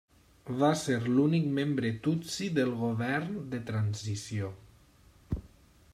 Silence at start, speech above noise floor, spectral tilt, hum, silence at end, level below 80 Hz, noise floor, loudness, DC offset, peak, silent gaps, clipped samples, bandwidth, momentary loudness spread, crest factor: 0.45 s; 30 dB; -6 dB/octave; none; 0.45 s; -54 dBFS; -60 dBFS; -31 LUFS; under 0.1%; -14 dBFS; none; under 0.1%; 14.5 kHz; 13 LU; 18 dB